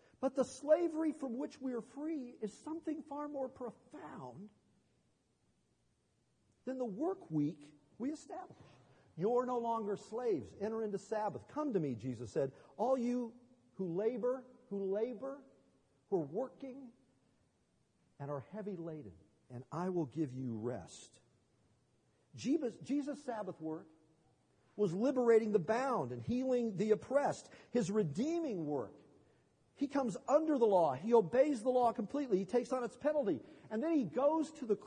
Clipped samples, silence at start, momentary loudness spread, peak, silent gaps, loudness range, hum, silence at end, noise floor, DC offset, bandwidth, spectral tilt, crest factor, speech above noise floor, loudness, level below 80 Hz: under 0.1%; 0.2 s; 16 LU; -18 dBFS; none; 12 LU; none; 0 s; -78 dBFS; under 0.1%; 10 kHz; -7 dB/octave; 20 dB; 41 dB; -37 LUFS; -80 dBFS